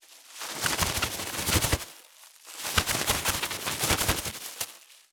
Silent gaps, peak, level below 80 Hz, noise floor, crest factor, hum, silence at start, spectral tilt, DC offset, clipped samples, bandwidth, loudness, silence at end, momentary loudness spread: none; -6 dBFS; -44 dBFS; -53 dBFS; 26 dB; none; 0.1 s; -2 dB/octave; under 0.1%; under 0.1%; over 20 kHz; -28 LUFS; 0.15 s; 11 LU